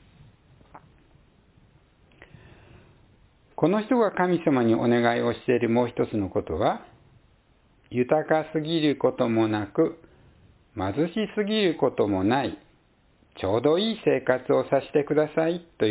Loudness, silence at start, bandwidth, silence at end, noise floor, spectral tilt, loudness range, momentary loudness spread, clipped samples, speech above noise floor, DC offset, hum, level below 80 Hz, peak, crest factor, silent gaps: -25 LUFS; 0.75 s; 4 kHz; 0 s; -62 dBFS; -10.5 dB/octave; 3 LU; 6 LU; under 0.1%; 38 dB; under 0.1%; none; -54 dBFS; -6 dBFS; 20 dB; none